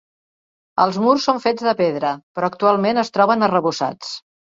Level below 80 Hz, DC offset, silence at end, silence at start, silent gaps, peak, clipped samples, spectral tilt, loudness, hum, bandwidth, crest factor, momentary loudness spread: -64 dBFS; under 0.1%; 0.35 s; 0.75 s; 2.23-2.35 s; -2 dBFS; under 0.1%; -5.5 dB/octave; -18 LUFS; none; 7.8 kHz; 18 dB; 9 LU